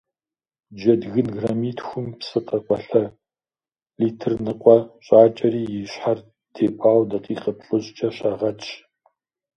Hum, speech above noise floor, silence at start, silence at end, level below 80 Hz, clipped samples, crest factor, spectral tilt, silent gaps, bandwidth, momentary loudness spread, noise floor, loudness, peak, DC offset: none; over 70 dB; 0.7 s; 0.8 s; -60 dBFS; under 0.1%; 20 dB; -7.5 dB/octave; none; 7.2 kHz; 13 LU; under -90 dBFS; -21 LUFS; 0 dBFS; under 0.1%